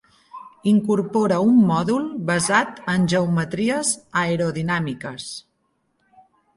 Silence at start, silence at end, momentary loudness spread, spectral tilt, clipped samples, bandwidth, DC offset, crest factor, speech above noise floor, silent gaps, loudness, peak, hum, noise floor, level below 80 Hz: 0.35 s; 1.15 s; 15 LU; -5 dB/octave; under 0.1%; 11.5 kHz; under 0.1%; 18 dB; 49 dB; none; -20 LUFS; -4 dBFS; none; -69 dBFS; -58 dBFS